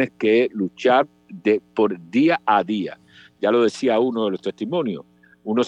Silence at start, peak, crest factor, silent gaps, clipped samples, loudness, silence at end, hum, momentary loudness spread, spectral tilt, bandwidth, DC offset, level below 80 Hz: 0 s; -4 dBFS; 16 dB; none; under 0.1%; -21 LUFS; 0 s; none; 9 LU; -6 dB/octave; 10 kHz; under 0.1%; -72 dBFS